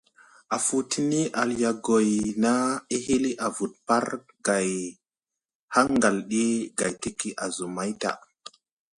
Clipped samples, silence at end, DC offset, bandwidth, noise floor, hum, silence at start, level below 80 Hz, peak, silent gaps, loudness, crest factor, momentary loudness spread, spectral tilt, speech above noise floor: under 0.1%; 0.8 s; under 0.1%; 11.5 kHz; -90 dBFS; none; 0.5 s; -60 dBFS; -6 dBFS; 5.55-5.68 s; -26 LUFS; 20 dB; 9 LU; -4 dB/octave; 64 dB